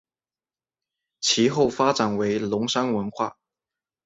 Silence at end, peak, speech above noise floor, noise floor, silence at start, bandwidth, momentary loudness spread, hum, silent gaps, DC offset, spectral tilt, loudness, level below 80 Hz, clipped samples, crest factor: 0.75 s; -6 dBFS; over 67 dB; under -90 dBFS; 1.2 s; 8 kHz; 8 LU; none; none; under 0.1%; -4 dB/octave; -23 LUFS; -62 dBFS; under 0.1%; 20 dB